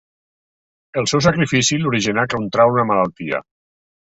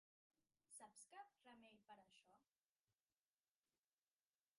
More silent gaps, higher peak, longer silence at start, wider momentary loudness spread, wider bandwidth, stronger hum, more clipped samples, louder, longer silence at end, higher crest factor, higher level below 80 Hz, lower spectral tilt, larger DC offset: second, none vs 2.70-2.87 s; first, -2 dBFS vs -50 dBFS; first, 0.95 s vs 0.4 s; first, 10 LU vs 6 LU; second, 8.2 kHz vs 11.5 kHz; neither; neither; first, -17 LUFS vs -66 LUFS; second, 0.65 s vs 1.65 s; about the same, 18 dB vs 22 dB; first, -50 dBFS vs under -90 dBFS; first, -4.5 dB/octave vs -1.5 dB/octave; neither